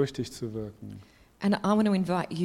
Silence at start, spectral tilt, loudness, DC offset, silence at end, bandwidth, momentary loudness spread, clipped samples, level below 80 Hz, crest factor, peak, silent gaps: 0 s; -6.5 dB/octave; -28 LUFS; under 0.1%; 0 s; 13 kHz; 21 LU; under 0.1%; -58 dBFS; 16 dB; -12 dBFS; none